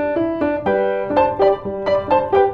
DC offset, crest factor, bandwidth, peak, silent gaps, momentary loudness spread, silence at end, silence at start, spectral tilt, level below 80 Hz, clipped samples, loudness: under 0.1%; 14 dB; 5.4 kHz; -4 dBFS; none; 5 LU; 0 s; 0 s; -8 dB/octave; -46 dBFS; under 0.1%; -18 LUFS